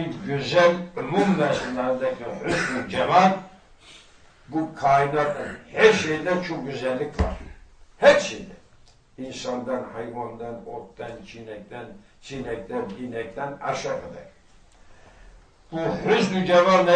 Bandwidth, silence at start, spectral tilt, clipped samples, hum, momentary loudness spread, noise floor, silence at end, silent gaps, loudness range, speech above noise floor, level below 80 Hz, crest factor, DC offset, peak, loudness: 9.8 kHz; 0 s; -5 dB/octave; under 0.1%; none; 20 LU; -53 dBFS; 0 s; none; 12 LU; 30 dB; -46 dBFS; 22 dB; under 0.1%; -2 dBFS; -23 LUFS